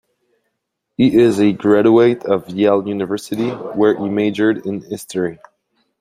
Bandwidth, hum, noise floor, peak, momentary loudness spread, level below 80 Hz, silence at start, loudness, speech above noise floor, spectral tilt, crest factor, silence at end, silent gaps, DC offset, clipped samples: 15 kHz; none; -75 dBFS; -2 dBFS; 12 LU; -56 dBFS; 1 s; -16 LUFS; 60 dB; -6.5 dB/octave; 14 dB; 0.65 s; none; under 0.1%; under 0.1%